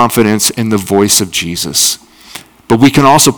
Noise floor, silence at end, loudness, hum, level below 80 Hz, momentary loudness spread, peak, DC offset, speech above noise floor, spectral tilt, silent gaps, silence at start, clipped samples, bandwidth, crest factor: -33 dBFS; 0 s; -9 LUFS; none; -44 dBFS; 24 LU; 0 dBFS; under 0.1%; 24 dB; -3.5 dB/octave; none; 0 s; 3%; over 20 kHz; 10 dB